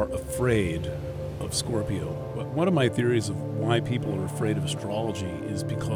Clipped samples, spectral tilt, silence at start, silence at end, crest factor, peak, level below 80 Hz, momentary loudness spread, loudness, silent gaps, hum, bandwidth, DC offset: under 0.1%; -6 dB/octave; 0 s; 0 s; 16 dB; -10 dBFS; -46 dBFS; 9 LU; -28 LUFS; none; none; 18 kHz; under 0.1%